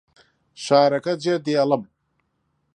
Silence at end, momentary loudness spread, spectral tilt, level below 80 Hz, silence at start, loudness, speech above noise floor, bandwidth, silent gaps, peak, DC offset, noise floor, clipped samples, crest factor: 0.95 s; 7 LU; -5.5 dB/octave; -72 dBFS; 0.6 s; -20 LUFS; 52 dB; 10.5 kHz; none; -2 dBFS; under 0.1%; -71 dBFS; under 0.1%; 20 dB